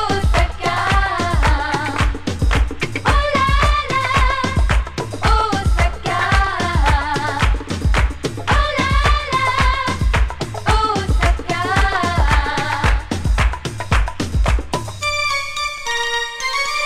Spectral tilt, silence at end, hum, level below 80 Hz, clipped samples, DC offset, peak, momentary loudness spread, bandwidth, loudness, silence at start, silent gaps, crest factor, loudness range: -4.5 dB/octave; 0 s; none; -20 dBFS; under 0.1%; under 0.1%; 0 dBFS; 5 LU; 12.5 kHz; -18 LUFS; 0 s; none; 16 dB; 2 LU